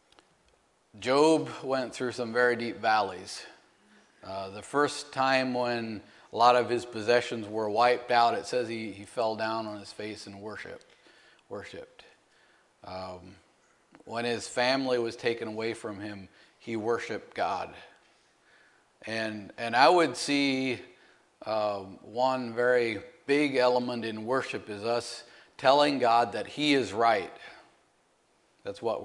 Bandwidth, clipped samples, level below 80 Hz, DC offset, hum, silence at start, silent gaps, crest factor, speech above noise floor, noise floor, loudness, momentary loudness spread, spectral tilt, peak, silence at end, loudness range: 11.5 kHz; under 0.1%; -76 dBFS; under 0.1%; none; 0.95 s; none; 24 dB; 40 dB; -68 dBFS; -28 LUFS; 18 LU; -4 dB/octave; -6 dBFS; 0 s; 10 LU